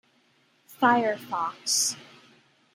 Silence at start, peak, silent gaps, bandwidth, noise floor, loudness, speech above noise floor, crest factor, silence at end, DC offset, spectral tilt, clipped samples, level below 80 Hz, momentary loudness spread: 0.7 s; -8 dBFS; none; 16.5 kHz; -65 dBFS; -25 LUFS; 40 dB; 22 dB; 0.7 s; under 0.1%; -1.5 dB/octave; under 0.1%; -82 dBFS; 9 LU